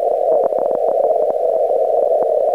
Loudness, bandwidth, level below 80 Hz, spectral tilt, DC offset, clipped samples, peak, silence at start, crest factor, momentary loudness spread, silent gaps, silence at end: -16 LUFS; 10.5 kHz; -62 dBFS; -7 dB/octave; 0.2%; under 0.1%; -4 dBFS; 0 s; 12 dB; 2 LU; none; 0 s